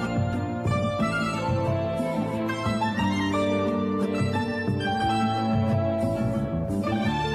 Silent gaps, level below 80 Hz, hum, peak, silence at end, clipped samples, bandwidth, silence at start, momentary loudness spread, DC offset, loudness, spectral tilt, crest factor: none; -46 dBFS; none; -12 dBFS; 0 s; under 0.1%; 13.5 kHz; 0 s; 3 LU; under 0.1%; -26 LUFS; -7 dB/octave; 12 dB